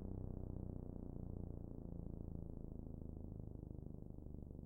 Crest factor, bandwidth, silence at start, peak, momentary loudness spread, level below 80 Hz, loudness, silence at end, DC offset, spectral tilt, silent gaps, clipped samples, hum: 16 dB; 1.8 kHz; 0 s; -34 dBFS; 4 LU; -54 dBFS; -52 LUFS; 0 s; under 0.1%; -12 dB/octave; none; under 0.1%; none